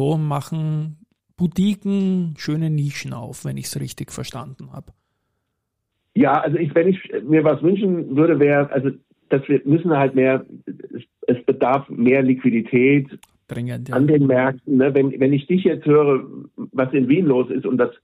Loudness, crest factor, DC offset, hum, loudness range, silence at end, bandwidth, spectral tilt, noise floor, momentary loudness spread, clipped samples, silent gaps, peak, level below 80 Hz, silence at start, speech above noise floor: -19 LUFS; 14 dB; under 0.1%; none; 7 LU; 0.1 s; 15.5 kHz; -7.5 dB/octave; -76 dBFS; 15 LU; under 0.1%; none; -4 dBFS; -58 dBFS; 0 s; 58 dB